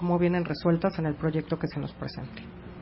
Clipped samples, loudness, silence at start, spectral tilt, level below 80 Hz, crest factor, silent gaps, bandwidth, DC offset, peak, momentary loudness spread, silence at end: under 0.1%; -29 LUFS; 0 s; -11.5 dB/octave; -50 dBFS; 16 dB; none; 5.8 kHz; under 0.1%; -12 dBFS; 15 LU; 0 s